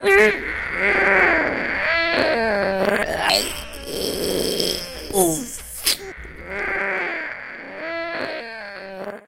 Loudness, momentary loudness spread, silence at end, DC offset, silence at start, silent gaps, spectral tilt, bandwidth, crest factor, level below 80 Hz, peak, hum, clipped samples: -20 LUFS; 16 LU; 0.1 s; under 0.1%; 0 s; none; -2.5 dB/octave; 17 kHz; 20 dB; -44 dBFS; -2 dBFS; none; under 0.1%